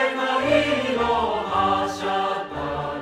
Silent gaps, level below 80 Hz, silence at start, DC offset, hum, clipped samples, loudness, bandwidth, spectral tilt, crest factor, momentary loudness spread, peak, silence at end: none; -48 dBFS; 0 s; under 0.1%; none; under 0.1%; -22 LUFS; 15 kHz; -4.5 dB/octave; 16 dB; 8 LU; -6 dBFS; 0 s